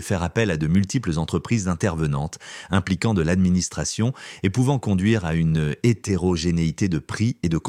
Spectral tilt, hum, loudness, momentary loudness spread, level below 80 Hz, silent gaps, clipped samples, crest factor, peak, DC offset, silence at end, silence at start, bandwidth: -6 dB/octave; none; -22 LUFS; 5 LU; -40 dBFS; none; under 0.1%; 18 dB; -4 dBFS; under 0.1%; 0 s; 0 s; 13 kHz